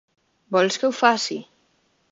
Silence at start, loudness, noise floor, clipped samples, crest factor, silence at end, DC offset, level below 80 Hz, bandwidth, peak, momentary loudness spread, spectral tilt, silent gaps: 0.5 s; -21 LUFS; -66 dBFS; under 0.1%; 22 dB; 0.7 s; under 0.1%; -72 dBFS; 7.8 kHz; -2 dBFS; 9 LU; -3 dB/octave; none